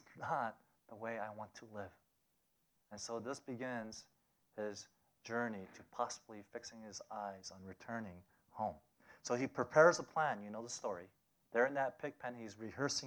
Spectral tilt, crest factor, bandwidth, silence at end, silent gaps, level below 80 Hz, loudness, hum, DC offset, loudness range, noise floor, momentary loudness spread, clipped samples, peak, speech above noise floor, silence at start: -4 dB/octave; 26 dB; over 20 kHz; 0 s; none; -82 dBFS; -40 LUFS; none; under 0.1%; 12 LU; -81 dBFS; 17 LU; under 0.1%; -14 dBFS; 41 dB; 0.1 s